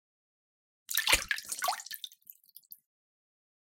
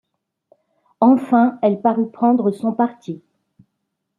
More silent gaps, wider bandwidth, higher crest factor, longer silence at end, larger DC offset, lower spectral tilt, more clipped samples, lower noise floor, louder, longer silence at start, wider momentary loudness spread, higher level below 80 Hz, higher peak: neither; first, 17 kHz vs 4.3 kHz; first, 28 dB vs 18 dB; first, 1.55 s vs 1.05 s; neither; second, 1 dB/octave vs -9 dB/octave; neither; second, -57 dBFS vs -76 dBFS; second, -31 LUFS vs -17 LUFS; about the same, 0.9 s vs 1 s; first, 25 LU vs 14 LU; first, -56 dBFS vs -70 dBFS; second, -8 dBFS vs -2 dBFS